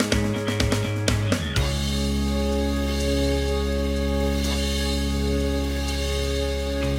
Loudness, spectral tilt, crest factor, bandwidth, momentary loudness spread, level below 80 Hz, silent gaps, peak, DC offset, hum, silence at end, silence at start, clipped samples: -24 LUFS; -5 dB/octave; 20 dB; 16.5 kHz; 2 LU; -28 dBFS; none; -4 dBFS; under 0.1%; none; 0 s; 0 s; under 0.1%